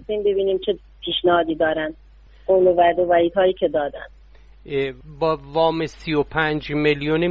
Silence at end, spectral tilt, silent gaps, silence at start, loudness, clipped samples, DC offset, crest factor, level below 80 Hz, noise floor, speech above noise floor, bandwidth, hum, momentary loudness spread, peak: 0 s; -7 dB/octave; none; 0 s; -20 LUFS; under 0.1%; under 0.1%; 16 dB; -46 dBFS; -47 dBFS; 27 dB; 7.2 kHz; none; 11 LU; -6 dBFS